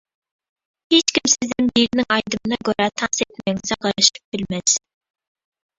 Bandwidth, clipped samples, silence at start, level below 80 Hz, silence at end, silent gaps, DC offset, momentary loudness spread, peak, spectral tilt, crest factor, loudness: 8 kHz; under 0.1%; 0.9 s; -54 dBFS; 1 s; 4.24-4.32 s; under 0.1%; 8 LU; 0 dBFS; -2 dB/octave; 22 dB; -19 LUFS